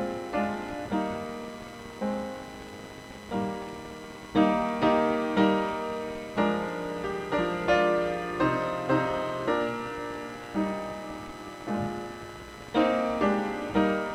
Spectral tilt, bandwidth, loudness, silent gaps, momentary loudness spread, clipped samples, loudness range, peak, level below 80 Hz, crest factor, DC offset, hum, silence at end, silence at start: -6 dB/octave; 15.5 kHz; -29 LUFS; none; 16 LU; under 0.1%; 7 LU; -10 dBFS; -54 dBFS; 20 dB; under 0.1%; none; 0 s; 0 s